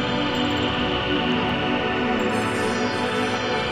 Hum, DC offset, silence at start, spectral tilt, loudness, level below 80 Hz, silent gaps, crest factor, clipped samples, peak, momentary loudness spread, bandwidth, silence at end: none; under 0.1%; 0 s; -5 dB/octave; -22 LUFS; -44 dBFS; none; 12 dB; under 0.1%; -10 dBFS; 1 LU; 15.5 kHz; 0 s